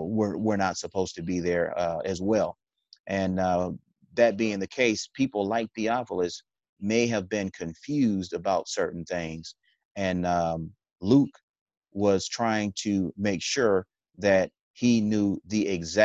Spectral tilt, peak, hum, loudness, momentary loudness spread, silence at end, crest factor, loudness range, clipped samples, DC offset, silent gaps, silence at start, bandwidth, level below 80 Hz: -5 dB/octave; -6 dBFS; none; -27 LUFS; 11 LU; 0 s; 20 dB; 3 LU; under 0.1%; under 0.1%; 3.00-3.04 s, 6.69-6.76 s, 9.85-9.95 s, 10.92-10.96 s, 11.43-11.54 s, 11.61-11.66 s, 11.77-11.81 s, 14.61-14.74 s; 0 s; 8.4 kHz; -54 dBFS